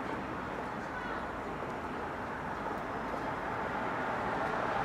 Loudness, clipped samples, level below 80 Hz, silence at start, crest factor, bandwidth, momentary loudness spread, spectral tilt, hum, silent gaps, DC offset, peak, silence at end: -37 LUFS; under 0.1%; -56 dBFS; 0 s; 16 dB; 15 kHz; 5 LU; -6 dB/octave; none; none; under 0.1%; -20 dBFS; 0 s